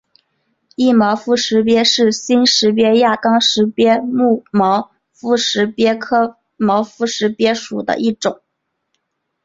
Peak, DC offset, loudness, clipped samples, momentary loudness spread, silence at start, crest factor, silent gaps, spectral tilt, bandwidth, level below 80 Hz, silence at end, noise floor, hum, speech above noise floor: -2 dBFS; under 0.1%; -14 LUFS; under 0.1%; 8 LU; 0.8 s; 14 dB; none; -4 dB/octave; 7.8 kHz; -58 dBFS; 1.1 s; -73 dBFS; none; 59 dB